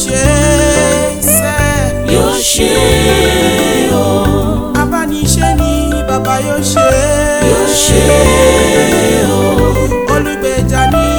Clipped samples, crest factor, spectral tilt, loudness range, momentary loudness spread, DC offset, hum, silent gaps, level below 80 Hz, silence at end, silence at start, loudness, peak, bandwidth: 0.2%; 10 dB; -4 dB/octave; 3 LU; 6 LU; under 0.1%; none; none; -20 dBFS; 0 s; 0 s; -10 LUFS; 0 dBFS; over 20 kHz